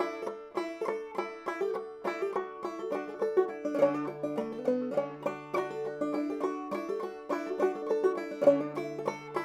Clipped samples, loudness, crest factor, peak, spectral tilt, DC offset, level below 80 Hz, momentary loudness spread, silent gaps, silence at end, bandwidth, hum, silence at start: under 0.1%; -33 LUFS; 22 dB; -10 dBFS; -6.5 dB/octave; under 0.1%; -76 dBFS; 9 LU; none; 0 s; 14 kHz; none; 0 s